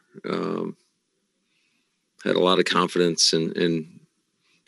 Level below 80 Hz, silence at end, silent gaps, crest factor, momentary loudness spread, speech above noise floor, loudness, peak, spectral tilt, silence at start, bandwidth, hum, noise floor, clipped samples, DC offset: -76 dBFS; 0.8 s; none; 20 dB; 13 LU; 51 dB; -22 LUFS; -4 dBFS; -3.5 dB/octave; 0.15 s; 12.5 kHz; none; -73 dBFS; under 0.1%; under 0.1%